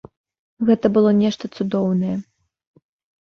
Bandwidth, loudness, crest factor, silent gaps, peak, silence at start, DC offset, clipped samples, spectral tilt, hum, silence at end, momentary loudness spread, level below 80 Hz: 6.8 kHz; -19 LUFS; 18 dB; none; -2 dBFS; 0.6 s; under 0.1%; under 0.1%; -8 dB/octave; none; 1 s; 10 LU; -60 dBFS